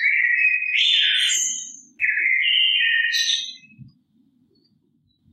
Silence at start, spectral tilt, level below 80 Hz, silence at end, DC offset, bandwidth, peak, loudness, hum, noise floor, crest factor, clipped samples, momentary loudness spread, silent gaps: 0 s; 4 dB/octave; -80 dBFS; 1.45 s; under 0.1%; 13.5 kHz; -8 dBFS; -17 LUFS; none; -65 dBFS; 14 dB; under 0.1%; 8 LU; none